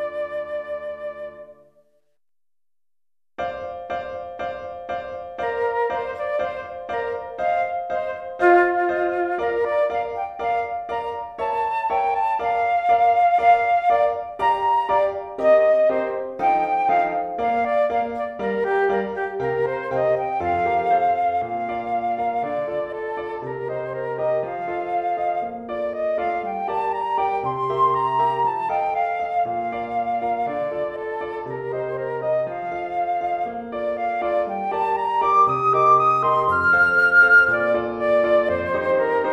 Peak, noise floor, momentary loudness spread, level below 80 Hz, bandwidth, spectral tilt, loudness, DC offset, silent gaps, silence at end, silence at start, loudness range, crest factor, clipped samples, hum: -4 dBFS; under -90 dBFS; 12 LU; -56 dBFS; 8.8 kHz; -6.5 dB/octave; -21 LUFS; under 0.1%; none; 0 s; 0 s; 10 LU; 18 dB; under 0.1%; none